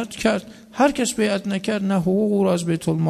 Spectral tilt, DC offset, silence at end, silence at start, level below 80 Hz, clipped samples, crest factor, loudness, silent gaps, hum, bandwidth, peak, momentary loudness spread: -5.5 dB/octave; under 0.1%; 0 s; 0 s; -52 dBFS; under 0.1%; 16 dB; -21 LUFS; none; none; 13.5 kHz; -4 dBFS; 5 LU